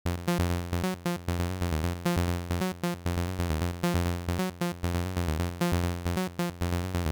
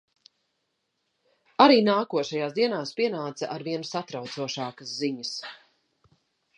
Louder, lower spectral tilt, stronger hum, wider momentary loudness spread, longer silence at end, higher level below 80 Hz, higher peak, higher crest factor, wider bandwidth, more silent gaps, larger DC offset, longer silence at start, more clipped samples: second, -31 LUFS vs -26 LUFS; first, -6 dB/octave vs -4.5 dB/octave; neither; second, 3 LU vs 15 LU; second, 0 s vs 1 s; first, -40 dBFS vs -80 dBFS; second, -16 dBFS vs -2 dBFS; second, 12 dB vs 26 dB; first, over 20 kHz vs 10.5 kHz; neither; neither; second, 0.05 s vs 1.6 s; neither